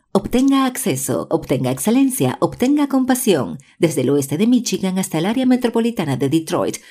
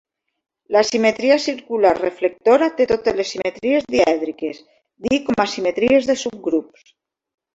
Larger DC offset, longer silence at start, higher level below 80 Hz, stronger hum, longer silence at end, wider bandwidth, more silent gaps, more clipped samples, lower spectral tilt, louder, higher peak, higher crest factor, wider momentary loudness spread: neither; second, 0.15 s vs 0.7 s; first, -48 dBFS vs -54 dBFS; neither; second, 0.15 s vs 0.9 s; first, 16 kHz vs 8 kHz; neither; neither; about the same, -5 dB/octave vs -4 dB/octave; about the same, -18 LUFS vs -18 LUFS; about the same, -2 dBFS vs -2 dBFS; about the same, 14 dB vs 18 dB; second, 5 LU vs 8 LU